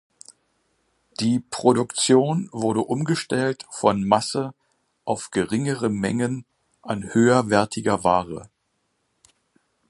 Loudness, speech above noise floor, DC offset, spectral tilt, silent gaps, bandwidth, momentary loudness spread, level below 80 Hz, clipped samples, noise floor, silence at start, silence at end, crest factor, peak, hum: -22 LUFS; 51 dB; under 0.1%; -5 dB/octave; none; 11.5 kHz; 12 LU; -56 dBFS; under 0.1%; -72 dBFS; 1.2 s; 1.45 s; 22 dB; -2 dBFS; none